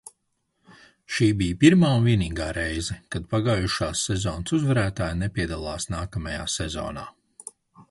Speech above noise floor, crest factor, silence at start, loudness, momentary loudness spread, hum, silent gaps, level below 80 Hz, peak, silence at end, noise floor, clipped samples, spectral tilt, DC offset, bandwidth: 51 dB; 20 dB; 1.1 s; -24 LUFS; 15 LU; none; none; -40 dBFS; -4 dBFS; 0.1 s; -74 dBFS; under 0.1%; -5.5 dB/octave; under 0.1%; 11.5 kHz